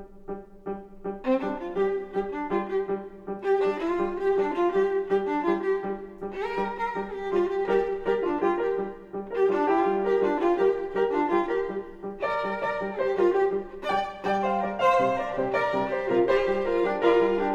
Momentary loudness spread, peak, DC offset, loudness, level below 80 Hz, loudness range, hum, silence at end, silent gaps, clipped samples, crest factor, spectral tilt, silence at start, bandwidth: 11 LU; -10 dBFS; under 0.1%; -26 LUFS; -52 dBFS; 3 LU; none; 0 s; none; under 0.1%; 16 dB; -7 dB/octave; 0 s; 7.4 kHz